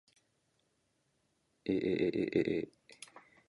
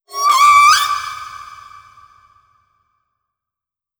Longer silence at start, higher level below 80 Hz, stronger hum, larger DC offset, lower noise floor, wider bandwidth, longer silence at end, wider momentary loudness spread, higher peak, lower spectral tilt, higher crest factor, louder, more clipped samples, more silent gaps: first, 1.65 s vs 0.1 s; second, -68 dBFS vs -58 dBFS; neither; neither; second, -78 dBFS vs -87 dBFS; second, 11.5 kHz vs over 20 kHz; second, 0.3 s vs 2.45 s; second, 21 LU vs 24 LU; second, -16 dBFS vs 0 dBFS; first, -7 dB/octave vs 2.5 dB/octave; first, 22 dB vs 16 dB; second, -35 LUFS vs -11 LUFS; neither; neither